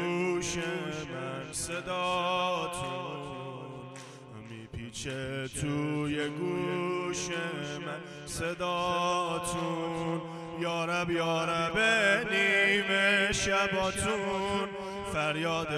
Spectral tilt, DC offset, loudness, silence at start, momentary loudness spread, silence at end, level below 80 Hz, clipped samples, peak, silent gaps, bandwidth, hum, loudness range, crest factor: -3.5 dB/octave; under 0.1%; -30 LUFS; 0 s; 15 LU; 0 s; -56 dBFS; under 0.1%; -12 dBFS; none; 15 kHz; none; 10 LU; 18 dB